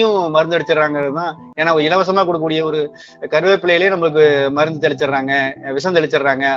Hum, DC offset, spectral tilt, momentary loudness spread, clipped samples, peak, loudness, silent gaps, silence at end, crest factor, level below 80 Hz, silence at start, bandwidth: none; under 0.1%; -5.5 dB/octave; 8 LU; under 0.1%; 0 dBFS; -15 LUFS; none; 0 s; 14 dB; -60 dBFS; 0 s; 7.6 kHz